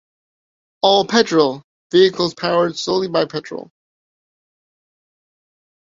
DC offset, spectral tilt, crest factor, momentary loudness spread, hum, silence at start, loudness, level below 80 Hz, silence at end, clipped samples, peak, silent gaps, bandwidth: under 0.1%; -4.5 dB/octave; 18 dB; 14 LU; none; 0.85 s; -17 LUFS; -62 dBFS; 2.2 s; under 0.1%; -2 dBFS; 1.64-1.90 s; 7.6 kHz